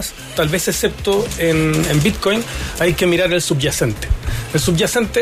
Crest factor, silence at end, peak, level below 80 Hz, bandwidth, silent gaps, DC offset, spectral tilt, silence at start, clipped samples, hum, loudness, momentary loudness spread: 14 dB; 0 s; -4 dBFS; -30 dBFS; 15.5 kHz; none; under 0.1%; -4.5 dB/octave; 0 s; under 0.1%; none; -17 LUFS; 6 LU